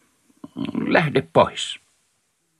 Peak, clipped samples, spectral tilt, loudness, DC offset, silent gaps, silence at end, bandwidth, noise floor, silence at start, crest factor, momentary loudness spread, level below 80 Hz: -2 dBFS; under 0.1%; -5 dB/octave; -21 LUFS; under 0.1%; none; 0.85 s; 12.5 kHz; -69 dBFS; 0.55 s; 22 dB; 16 LU; -58 dBFS